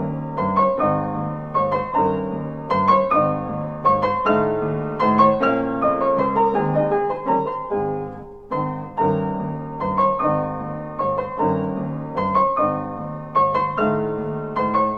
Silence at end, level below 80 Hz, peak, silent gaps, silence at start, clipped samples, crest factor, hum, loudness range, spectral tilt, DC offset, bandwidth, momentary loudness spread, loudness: 0 s; -50 dBFS; -4 dBFS; none; 0 s; under 0.1%; 18 dB; none; 4 LU; -9.5 dB/octave; 0.3%; 6.2 kHz; 9 LU; -21 LUFS